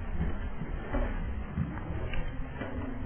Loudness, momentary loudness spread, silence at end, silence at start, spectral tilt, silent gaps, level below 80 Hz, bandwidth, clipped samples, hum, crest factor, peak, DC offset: -37 LUFS; 4 LU; 0 s; 0 s; -10.5 dB/octave; none; -36 dBFS; 3.4 kHz; under 0.1%; none; 14 dB; -20 dBFS; under 0.1%